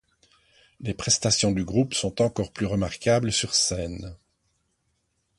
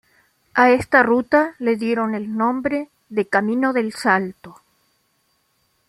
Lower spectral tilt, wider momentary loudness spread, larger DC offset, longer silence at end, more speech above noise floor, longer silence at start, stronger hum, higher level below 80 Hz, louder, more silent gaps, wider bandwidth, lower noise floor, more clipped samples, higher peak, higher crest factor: second, -3.5 dB/octave vs -6 dB/octave; first, 13 LU vs 9 LU; neither; about the same, 1.25 s vs 1.35 s; about the same, 48 dB vs 47 dB; first, 0.8 s vs 0.55 s; neither; first, -48 dBFS vs -58 dBFS; second, -24 LUFS vs -19 LUFS; neither; second, 11.5 kHz vs 13 kHz; first, -73 dBFS vs -66 dBFS; neither; second, -8 dBFS vs -2 dBFS; about the same, 18 dB vs 18 dB